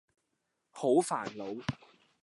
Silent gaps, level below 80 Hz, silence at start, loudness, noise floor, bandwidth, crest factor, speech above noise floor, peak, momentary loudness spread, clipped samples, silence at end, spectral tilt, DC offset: none; -68 dBFS; 0.75 s; -33 LUFS; -82 dBFS; 11.5 kHz; 20 dB; 51 dB; -14 dBFS; 12 LU; under 0.1%; 0.5 s; -5.5 dB/octave; under 0.1%